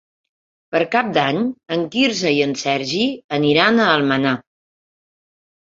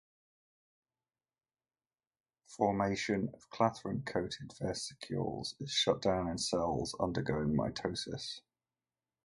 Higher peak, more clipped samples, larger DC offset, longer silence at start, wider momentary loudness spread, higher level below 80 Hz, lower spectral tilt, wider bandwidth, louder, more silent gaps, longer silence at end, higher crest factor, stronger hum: first, -2 dBFS vs -14 dBFS; neither; neither; second, 0.7 s vs 2.5 s; about the same, 8 LU vs 9 LU; about the same, -62 dBFS vs -60 dBFS; about the same, -4.5 dB/octave vs -4.5 dB/octave; second, 7.8 kHz vs 11.5 kHz; first, -18 LUFS vs -35 LUFS; first, 3.24-3.29 s vs none; first, 1.4 s vs 0.85 s; second, 18 dB vs 24 dB; neither